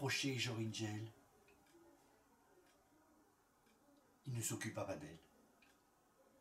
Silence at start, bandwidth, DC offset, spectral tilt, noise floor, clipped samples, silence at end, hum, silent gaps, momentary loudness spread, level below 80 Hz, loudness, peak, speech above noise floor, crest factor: 0 s; 16 kHz; under 0.1%; -4 dB/octave; -74 dBFS; under 0.1%; 1.15 s; none; none; 17 LU; -80 dBFS; -44 LUFS; -28 dBFS; 30 dB; 22 dB